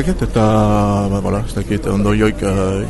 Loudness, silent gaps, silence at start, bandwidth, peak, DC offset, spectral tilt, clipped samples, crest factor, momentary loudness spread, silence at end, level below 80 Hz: -16 LUFS; none; 0 s; 12 kHz; -2 dBFS; under 0.1%; -7 dB/octave; under 0.1%; 14 dB; 6 LU; 0 s; -26 dBFS